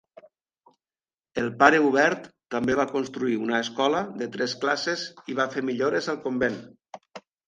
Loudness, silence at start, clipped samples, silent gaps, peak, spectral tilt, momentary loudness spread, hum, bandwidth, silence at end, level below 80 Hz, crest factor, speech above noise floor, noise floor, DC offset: -25 LUFS; 1.35 s; under 0.1%; none; -2 dBFS; -4.5 dB/octave; 14 LU; none; 9.6 kHz; 0.3 s; -64 dBFS; 24 dB; over 65 dB; under -90 dBFS; under 0.1%